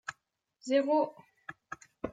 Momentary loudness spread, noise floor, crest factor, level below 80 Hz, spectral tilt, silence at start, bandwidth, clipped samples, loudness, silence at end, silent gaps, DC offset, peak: 21 LU; -76 dBFS; 18 dB; -68 dBFS; -4.5 dB/octave; 0.1 s; 9.2 kHz; under 0.1%; -31 LUFS; 0 s; none; under 0.1%; -16 dBFS